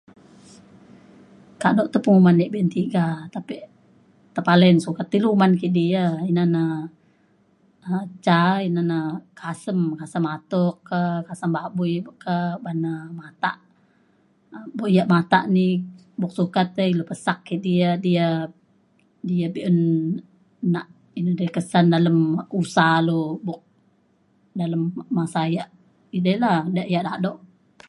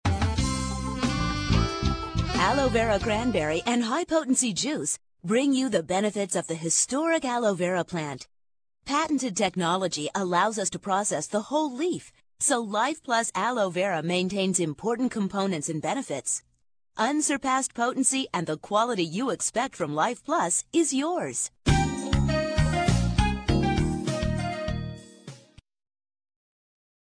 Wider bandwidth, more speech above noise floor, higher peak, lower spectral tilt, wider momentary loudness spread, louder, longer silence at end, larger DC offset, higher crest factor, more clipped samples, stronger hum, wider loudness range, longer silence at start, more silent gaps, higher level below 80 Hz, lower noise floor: about the same, 11 kHz vs 10.5 kHz; first, 41 dB vs 27 dB; first, -2 dBFS vs -8 dBFS; first, -7.5 dB/octave vs -4 dB/octave; first, 14 LU vs 6 LU; first, -22 LUFS vs -26 LUFS; second, 0.55 s vs 1.7 s; neither; about the same, 20 dB vs 20 dB; neither; neither; first, 6 LU vs 3 LU; first, 1.6 s vs 0.05 s; neither; second, -66 dBFS vs -38 dBFS; first, -62 dBFS vs -53 dBFS